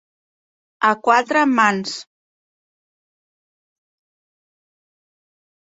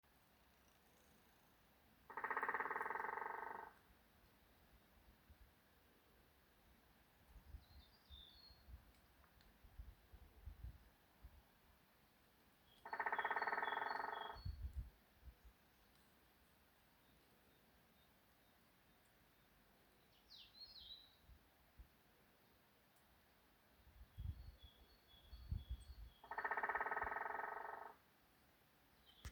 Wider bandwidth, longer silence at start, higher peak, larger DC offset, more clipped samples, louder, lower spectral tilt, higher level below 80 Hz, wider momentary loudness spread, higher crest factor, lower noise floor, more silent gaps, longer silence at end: second, 8 kHz vs over 20 kHz; first, 0.8 s vs 0.15 s; first, 0 dBFS vs -30 dBFS; neither; neither; first, -17 LUFS vs -47 LUFS; about the same, -4 dB/octave vs -5 dB/octave; second, -72 dBFS vs -64 dBFS; second, 12 LU vs 25 LU; about the same, 22 dB vs 24 dB; first, under -90 dBFS vs -74 dBFS; neither; first, 3.65 s vs 0 s